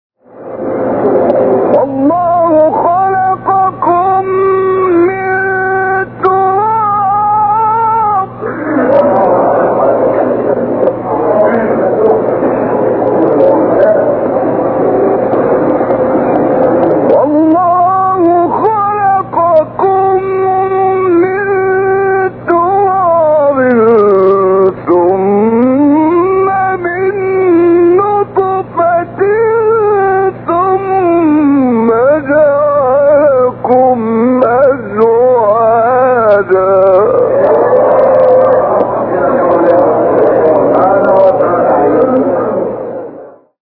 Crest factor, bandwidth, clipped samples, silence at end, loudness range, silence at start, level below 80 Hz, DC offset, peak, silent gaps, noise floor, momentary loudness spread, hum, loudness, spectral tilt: 8 dB; 4.5 kHz; 0.2%; 0.3 s; 2 LU; 0.35 s; -44 dBFS; under 0.1%; 0 dBFS; none; -32 dBFS; 5 LU; 50 Hz at -40 dBFS; -9 LUFS; -11.5 dB/octave